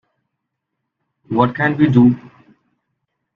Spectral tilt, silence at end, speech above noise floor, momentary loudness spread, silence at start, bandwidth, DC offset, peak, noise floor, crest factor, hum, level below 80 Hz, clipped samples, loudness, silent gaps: -9.5 dB/octave; 1.2 s; 63 dB; 10 LU; 1.3 s; 4.5 kHz; under 0.1%; 0 dBFS; -77 dBFS; 18 dB; none; -52 dBFS; under 0.1%; -15 LUFS; none